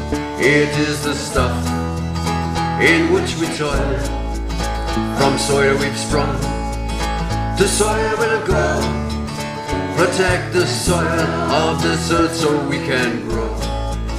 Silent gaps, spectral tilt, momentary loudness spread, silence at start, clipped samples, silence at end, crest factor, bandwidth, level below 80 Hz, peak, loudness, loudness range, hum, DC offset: none; -4.5 dB/octave; 8 LU; 0 s; under 0.1%; 0 s; 18 dB; 15.5 kHz; -28 dBFS; 0 dBFS; -18 LUFS; 2 LU; none; under 0.1%